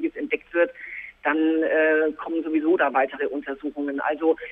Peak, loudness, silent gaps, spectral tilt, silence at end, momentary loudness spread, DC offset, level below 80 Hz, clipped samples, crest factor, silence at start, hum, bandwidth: -8 dBFS; -24 LUFS; none; -7 dB/octave; 0 s; 9 LU; under 0.1%; -64 dBFS; under 0.1%; 14 dB; 0 s; none; 3.8 kHz